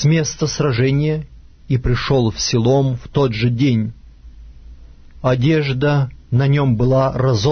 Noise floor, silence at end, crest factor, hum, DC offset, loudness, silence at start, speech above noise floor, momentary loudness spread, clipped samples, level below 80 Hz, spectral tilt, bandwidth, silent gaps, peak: -39 dBFS; 0 s; 14 dB; none; under 0.1%; -17 LUFS; 0 s; 24 dB; 6 LU; under 0.1%; -34 dBFS; -6 dB/octave; 6.6 kHz; none; -4 dBFS